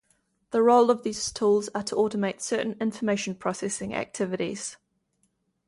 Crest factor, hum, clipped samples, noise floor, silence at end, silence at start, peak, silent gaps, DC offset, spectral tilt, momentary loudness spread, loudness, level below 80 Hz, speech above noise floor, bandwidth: 18 dB; none; under 0.1%; -73 dBFS; 0.9 s; 0.5 s; -8 dBFS; none; under 0.1%; -4.5 dB/octave; 10 LU; -26 LUFS; -64 dBFS; 47 dB; 11.5 kHz